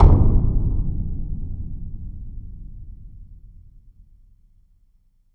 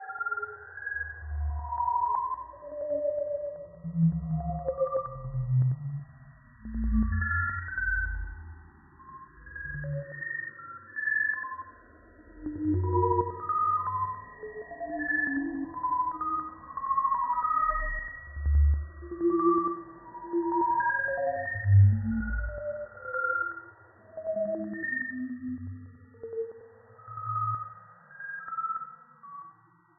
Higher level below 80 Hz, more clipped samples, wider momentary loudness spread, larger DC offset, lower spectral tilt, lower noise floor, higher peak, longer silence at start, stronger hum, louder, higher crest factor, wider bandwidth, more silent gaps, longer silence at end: first, -22 dBFS vs -40 dBFS; neither; first, 25 LU vs 17 LU; neither; first, -12 dB/octave vs -3.5 dB/octave; about the same, -58 dBFS vs -59 dBFS; first, -2 dBFS vs -12 dBFS; about the same, 0 s vs 0 s; neither; first, -24 LUFS vs -30 LUFS; about the same, 18 dB vs 18 dB; first, 2.3 kHz vs 2 kHz; neither; first, 1.9 s vs 0.45 s